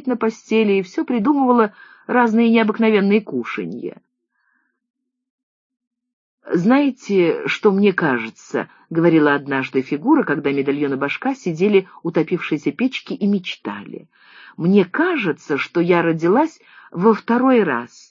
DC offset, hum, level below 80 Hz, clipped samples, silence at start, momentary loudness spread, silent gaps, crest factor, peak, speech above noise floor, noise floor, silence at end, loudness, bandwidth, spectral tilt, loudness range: under 0.1%; none; -70 dBFS; under 0.1%; 0.05 s; 11 LU; 4.90-4.94 s, 5.30-5.70 s, 5.87-5.91 s, 6.13-6.38 s; 18 dB; 0 dBFS; 49 dB; -67 dBFS; 0.25 s; -18 LUFS; 7.6 kHz; -7 dB/octave; 5 LU